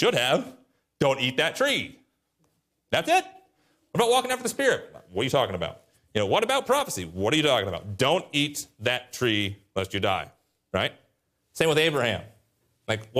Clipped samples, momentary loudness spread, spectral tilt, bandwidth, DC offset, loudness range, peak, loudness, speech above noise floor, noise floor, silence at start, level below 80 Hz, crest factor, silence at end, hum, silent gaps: under 0.1%; 10 LU; -3.5 dB/octave; 15.5 kHz; under 0.1%; 3 LU; -10 dBFS; -25 LUFS; 47 dB; -72 dBFS; 0 s; -62 dBFS; 18 dB; 0 s; none; none